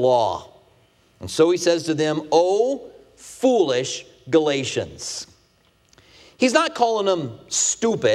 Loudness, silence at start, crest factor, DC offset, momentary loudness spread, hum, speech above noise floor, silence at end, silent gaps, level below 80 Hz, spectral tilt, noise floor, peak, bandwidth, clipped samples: -21 LUFS; 0 s; 20 dB; under 0.1%; 13 LU; none; 40 dB; 0 s; none; -60 dBFS; -3.5 dB/octave; -60 dBFS; -2 dBFS; 13 kHz; under 0.1%